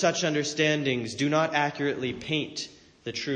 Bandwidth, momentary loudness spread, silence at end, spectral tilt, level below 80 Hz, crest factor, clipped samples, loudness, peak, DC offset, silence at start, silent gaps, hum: 9.6 kHz; 12 LU; 0 s; -4 dB/octave; -64 dBFS; 16 dB; under 0.1%; -27 LUFS; -10 dBFS; under 0.1%; 0 s; none; none